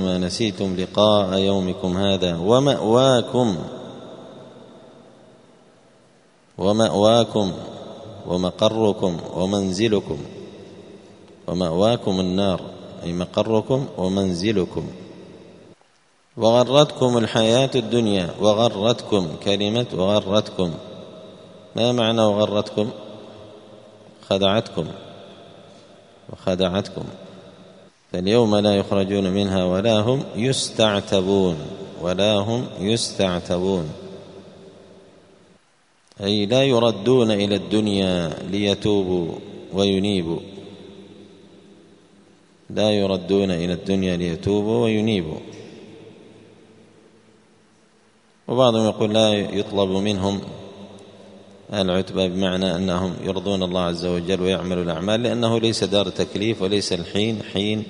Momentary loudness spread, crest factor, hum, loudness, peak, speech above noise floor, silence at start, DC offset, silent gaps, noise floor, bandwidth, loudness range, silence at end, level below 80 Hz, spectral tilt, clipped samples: 19 LU; 22 dB; none; -21 LUFS; 0 dBFS; 40 dB; 0 s; under 0.1%; none; -60 dBFS; 10.5 kHz; 7 LU; 0 s; -54 dBFS; -5.5 dB/octave; under 0.1%